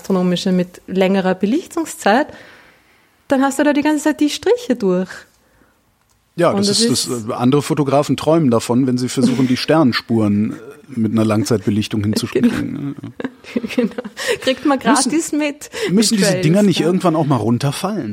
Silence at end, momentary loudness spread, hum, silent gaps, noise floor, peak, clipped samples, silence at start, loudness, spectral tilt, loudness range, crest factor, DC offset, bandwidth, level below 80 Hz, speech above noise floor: 0 s; 10 LU; none; none; -59 dBFS; -2 dBFS; under 0.1%; 0.05 s; -16 LUFS; -5 dB/octave; 3 LU; 16 dB; under 0.1%; 16.5 kHz; -54 dBFS; 43 dB